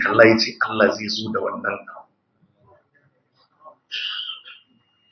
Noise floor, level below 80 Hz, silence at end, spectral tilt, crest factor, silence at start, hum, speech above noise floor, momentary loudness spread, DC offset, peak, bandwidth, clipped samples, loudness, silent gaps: -64 dBFS; -62 dBFS; 0.55 s; -4.5 dB/octave; 22 dB; 0 s; none; 45 dB; 18 LU; under 0.1%; 0 dBFS; 6.4 kHz; under 0.1%; -20 LUFS; none